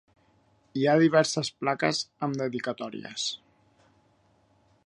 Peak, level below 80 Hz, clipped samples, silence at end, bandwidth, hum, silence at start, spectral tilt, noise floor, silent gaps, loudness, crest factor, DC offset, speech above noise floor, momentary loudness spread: -8 dBFS; -72 dBFS; under 0.1%; 1.5 s; 11.5 kHz; none; 0.75 s; -4.5 dB/octave; -65 dBFS; none; -27 LUFS; 22 dB; under 0.1%; 39 dB; 15 LU